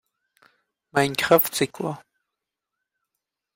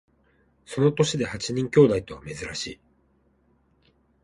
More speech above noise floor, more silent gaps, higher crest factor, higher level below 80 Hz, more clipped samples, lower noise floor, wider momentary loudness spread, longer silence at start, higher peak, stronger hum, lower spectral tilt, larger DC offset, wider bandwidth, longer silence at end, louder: first, 63 dB vs 41 dB; neither; about the same, 22 dB vs 22 dB; second, -64 dBFS vs -54 dBFS; neither; first, -84 dBFS vs -65 dBFS; second, 13 LU vs 16 LU; first, 0.95 s vs 0.7 s; about the same, -4 dBFS vs -4 dBFS; neither; second, -4 dB/octave vs -5.5 dB/octave; neither; first, 16.5 kHz vs 11.5 kHz; about the same, 1.55 s vs 1.5 s; about the same, -22 LUFS vs -24 LUFS